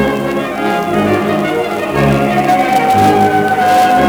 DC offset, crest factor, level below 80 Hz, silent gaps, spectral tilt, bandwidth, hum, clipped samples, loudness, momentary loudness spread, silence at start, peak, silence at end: under 0.1%; 10 dB; -38 dBFS; none; -6 dB/octave; over 20 kHz; none; under 0.1%; -12 LUFS; 6 LU; 0 s; 0 dBFS; 0 s